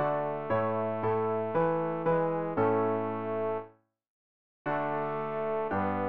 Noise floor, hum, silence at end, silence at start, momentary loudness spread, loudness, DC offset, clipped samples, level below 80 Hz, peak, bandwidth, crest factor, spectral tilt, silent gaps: -53 dBFS; none; 0 s; 0 s; 5 LU; -31 LUFS; 0.3%; under 0.1%; -66 dBFS; -14 dBFS; 4.6 kHz; 16 dB; -6.5 dB/octave; 4.08-4.65 s